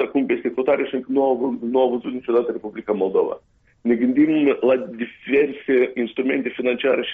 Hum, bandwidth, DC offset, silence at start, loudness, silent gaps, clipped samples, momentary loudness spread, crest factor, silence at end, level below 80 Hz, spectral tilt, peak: none; 4.4 kHz; under 0.1%; 0 s; -21 LUFS; none; under 0.1%; 9 LU; 14 dB; 0 s; -62 dBFS; -4 dB/octave; -8 dBFS